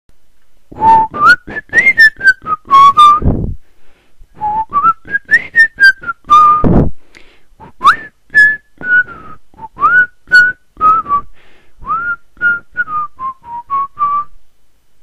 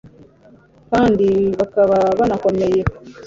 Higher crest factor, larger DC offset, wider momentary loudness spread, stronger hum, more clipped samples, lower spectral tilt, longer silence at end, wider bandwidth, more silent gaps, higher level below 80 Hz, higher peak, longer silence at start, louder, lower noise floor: about the same, 12 dB vs 16 dB; first, 2% vs under 0.1%; first, 14 LU vs 5 LU; neither; first, 0.7% vs under 0.1%; second, -4.5 dB/octave vs -7.5 dB/octave; first, 0.3 s vs 0 s; first, 13.5 kHz vs 7.6 kHz; neither; first, -30 dBFS vs -40 dBFS; about the same, 0 dBFS vs -2 dBFS; first, 0.75 s vs 0.05 s; first, -10 LUFS vs -16 LUFS; about the same, -48 dBFS vs -48 dBFS